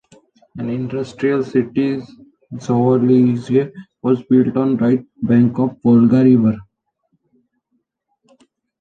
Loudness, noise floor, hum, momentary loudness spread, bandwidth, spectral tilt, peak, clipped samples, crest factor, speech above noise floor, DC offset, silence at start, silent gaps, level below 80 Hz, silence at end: -16 LUFS; -69 dBFS; none; 13 LU; 7.2 kHz; -9.5 dB/octave; -2 dBFS; under 0.1%; 16 dB; 54 dB; under 0.1%; 0.55 s; none; -56 dBFS; 2.2 s